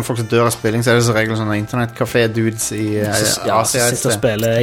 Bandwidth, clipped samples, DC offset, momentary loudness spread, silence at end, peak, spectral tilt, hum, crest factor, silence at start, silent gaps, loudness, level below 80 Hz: 17 kHz; under 0.1%; under 0.1%; 5 LU; 0 s; -2 dBFS; -4.5 dB/octave; none; 14 dB; 0 s; none; -16 LUFS; -46 dBFS